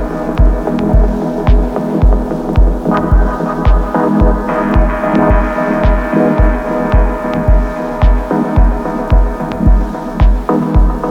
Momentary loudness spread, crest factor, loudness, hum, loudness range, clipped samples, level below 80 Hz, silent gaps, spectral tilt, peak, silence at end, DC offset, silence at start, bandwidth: 4 LU; 10 dB; -13 LUFS; none; 1 LU; under 0.1%; -12 dBFS; none; -9 dB/octave; 0 dBFS; 0 s; under 0.1%; 0 s; 5.6 kHz